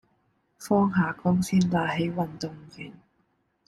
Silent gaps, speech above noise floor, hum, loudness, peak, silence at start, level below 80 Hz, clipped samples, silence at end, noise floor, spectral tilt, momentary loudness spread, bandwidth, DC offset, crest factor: none; 45 dB; none; -25 LUFS; -10 dBFS; 0.6 s; -58 dBFS; under 0.1%; 0.75 s; -71 dBFS; -6.5 dB/octave; 20 LU; 13 kHz; under 0.1%; 18 dB